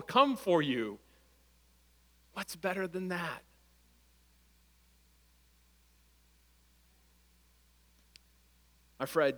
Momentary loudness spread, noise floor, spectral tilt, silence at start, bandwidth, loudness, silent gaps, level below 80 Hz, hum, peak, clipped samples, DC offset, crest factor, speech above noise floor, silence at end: 17 LU; -67 dBFS; -5 dB/octave; 0 s; over 20 kHz; -34 LUFS; none; -68 dBFS; none; -12 dBFS; under 0.1%; under 0.1%; 26 dB; 35 dB; 0 s